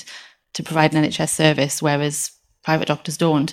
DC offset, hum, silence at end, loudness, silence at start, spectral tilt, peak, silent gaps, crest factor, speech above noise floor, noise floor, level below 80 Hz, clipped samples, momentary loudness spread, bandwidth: under 0.1%; none; 0 s; -19 LUFS; 0 s; -4.5 dB/octave; 0 dBFS; none; 20 dB; 23 dB; -42 dBFS; -58 dBFS; under 0.1%; 14 LU; 16 kHz